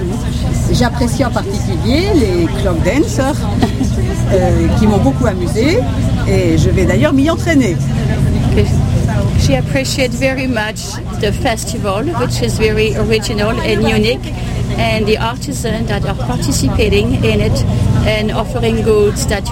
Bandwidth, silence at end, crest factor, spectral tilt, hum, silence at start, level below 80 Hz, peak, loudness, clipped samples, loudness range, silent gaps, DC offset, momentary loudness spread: 16.5 kHz; 0 s; 12 dB; -6 dB/octave; none; 0 s; -22 dBFS; 0 dBFS; -14 LUFS; under 0.1%; 3 LU; none; 0.3%; 6 LU